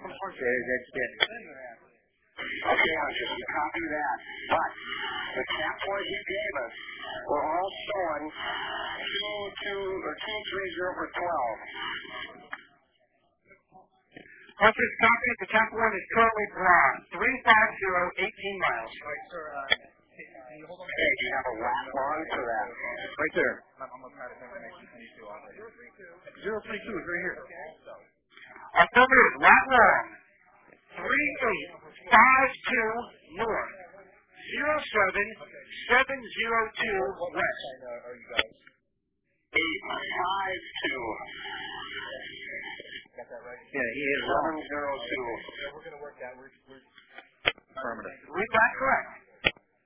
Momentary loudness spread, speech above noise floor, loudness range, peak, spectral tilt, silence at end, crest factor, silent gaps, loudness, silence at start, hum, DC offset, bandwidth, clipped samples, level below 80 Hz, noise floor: 22 LU; 50 dB; 13 LU; -2 dBFS; -0.5 dB/octave; 0.35 s; 28 dB; none; -27 LUFS; 0 s; none; under 0.1%; 4 kHz; under 0.1%; -60 dBFS; -78 dBFS